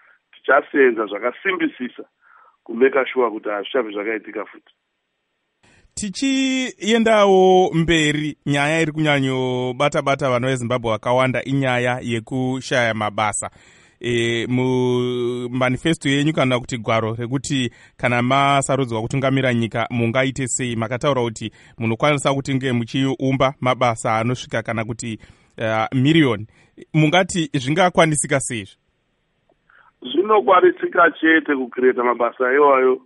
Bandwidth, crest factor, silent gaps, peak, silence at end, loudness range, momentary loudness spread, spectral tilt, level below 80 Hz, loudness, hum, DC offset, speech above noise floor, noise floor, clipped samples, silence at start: 11.5 kHz; 18 dB; none; -2 dBFS; 0.05 s; 5 LU; 11 LU; -5 dB/octave; -50 dBFS; -19 LUFS; none; under 0.1%; 54 dB; -73 dBFS; under 0.1%; 0.45 s